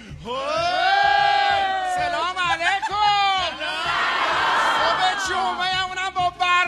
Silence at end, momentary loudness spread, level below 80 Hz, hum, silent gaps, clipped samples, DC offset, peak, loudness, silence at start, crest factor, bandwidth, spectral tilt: 0 s; 6 LU; -50 dBFS; none; none; under 0.1%; under 0.1%; -6 dBFS; -20 LUFS; 0 s; 14 dB; 13 kHz; -1.5 dB/octave